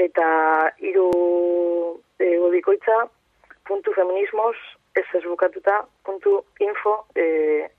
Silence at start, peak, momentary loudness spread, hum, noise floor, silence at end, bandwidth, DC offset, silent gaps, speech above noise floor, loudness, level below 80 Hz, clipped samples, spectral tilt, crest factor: 0 s; -8 dBFS; 8 LU; none; -51 dBFS; 0.1 s; 4.2 kHz; under 0.1%; none; 30 dB; -21 LUFS; -66 dBFS; under 0.1%; -6.5 dB/octave; 14 dB